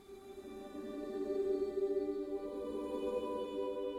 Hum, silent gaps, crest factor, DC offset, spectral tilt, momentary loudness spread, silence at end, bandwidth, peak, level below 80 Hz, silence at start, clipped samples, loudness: none; none; 12 dB; under 0.1%; -6 dB/octave; 13 LU; 0 s; 13 kHz; -26 dBFS; -66 dBFS; 0 s; under 0.1%; -39 LUFS